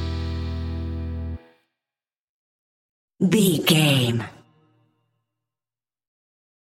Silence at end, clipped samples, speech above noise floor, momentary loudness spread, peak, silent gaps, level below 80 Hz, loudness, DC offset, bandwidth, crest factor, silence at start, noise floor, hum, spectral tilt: 2.4 s; under 0.1%; over 71 dB; 16 LU; -4 dBFS; 2.18-3.08 s; -40 dBFS; -22 LUFS; under 0.1%; 16.5 kHz; 22 dB; 0 s; under -90 dBFS; none; -5 dB/octave